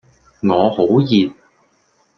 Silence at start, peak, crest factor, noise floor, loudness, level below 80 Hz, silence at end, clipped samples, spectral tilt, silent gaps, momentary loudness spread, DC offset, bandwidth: 0.45 s; -2 dBFS; 16 dB; -60 dBFS; -16 LUFS; -58 dBFS; 0.85 s; under 0.1%; -8 dB/octave; none; 8 LU; under 0.1%; 6.4 kHz